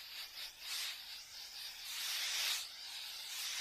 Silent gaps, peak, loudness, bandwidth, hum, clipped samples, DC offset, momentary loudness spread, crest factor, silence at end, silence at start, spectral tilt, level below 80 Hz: none; -24 dBFS; -41 LUFS; 15 kHz; none; under 0.1%; under 0.1%; 11 LU; 20 dB; 0 s; 0 s; 3.5 dB/octave; -78 dBFS